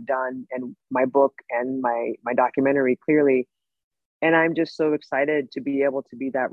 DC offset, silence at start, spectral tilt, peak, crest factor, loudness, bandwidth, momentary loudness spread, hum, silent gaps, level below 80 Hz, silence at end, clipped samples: under 0.1%; 0 s; -7.5 dB/octave; -6 dBFS; 16 dB; -23 LUFS; 7.2 kHz; 10 LU; none; 3.84-3.91 s, 4.05-4.20 s; -72 dBFS; 0 s; under 0.1%